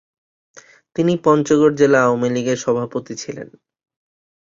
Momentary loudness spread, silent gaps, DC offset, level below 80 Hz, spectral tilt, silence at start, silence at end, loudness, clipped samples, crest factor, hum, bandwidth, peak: 16 LU; none; under 0.1%; -60 dBFS; -6 dB/octave; 1 s; 1.05 s; -17 LUFS; under 0.1%; 18 dB; none; 7.6 kHz; -2 dBFS